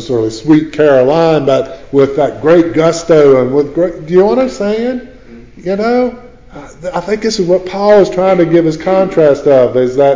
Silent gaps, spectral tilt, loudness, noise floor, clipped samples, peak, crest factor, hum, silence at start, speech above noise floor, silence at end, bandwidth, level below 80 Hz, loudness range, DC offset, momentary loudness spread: none; -6.5 dB/octave; -10 LUFS; -34 dBFS; under 0.1%; 0 dBFS; 10 dB; none; 0 s; 24 dB; 0 s; 7.6 kHz; -40 dBFS; 6 LU; 0.6%; 8 LU